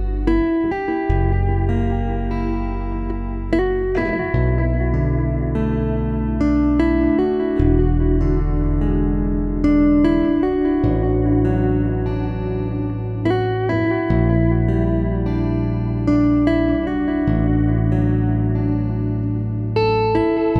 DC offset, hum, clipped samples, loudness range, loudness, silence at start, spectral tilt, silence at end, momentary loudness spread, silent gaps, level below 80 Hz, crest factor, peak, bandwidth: under 0.1%; none; under 0.1%; 3 LU; -19 LUFS; 0 s; -10 dB/octave; 0 s; 6 LU; none; -24 dBFS; 14 dB; -4 dBFS; 6 kHz